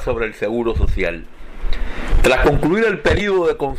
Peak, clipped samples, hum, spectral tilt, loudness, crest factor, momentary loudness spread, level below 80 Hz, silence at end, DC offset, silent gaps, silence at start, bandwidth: -2 dBFS; under 0.1%; none; -6 dB/octave; -18 LUFS; 14 dB; 14 LU; -22 dBFS; 0 s; under 0.1%; none; 0 s; 12 kHz